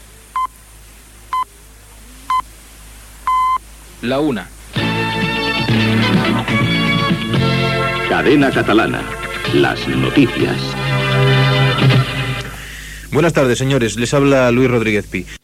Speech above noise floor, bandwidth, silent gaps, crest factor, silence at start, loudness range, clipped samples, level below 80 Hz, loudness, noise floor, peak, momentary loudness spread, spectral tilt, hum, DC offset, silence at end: 26 dB; 15 kHz; none; 16 dB; 0 s; 7 LU; under 0.1%; -36 dBFS; -15 LUFS; -41 dBFS; 0 dBFS; 11 LU; -5.5 dB/octave; none; under 0.1%; 0.05 s